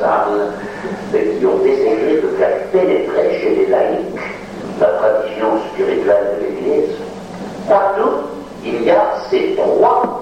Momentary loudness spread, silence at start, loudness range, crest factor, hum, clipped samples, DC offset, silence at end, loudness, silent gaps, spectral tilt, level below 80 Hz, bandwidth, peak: 12 LU; 0 s; 2 LU; 14 dB; none; under 0.1%; under 0.1%; 0 s; -15 LUFS; none; -6.5 dB/octave; -50 dBFS; 10 kHz; -2 dBFS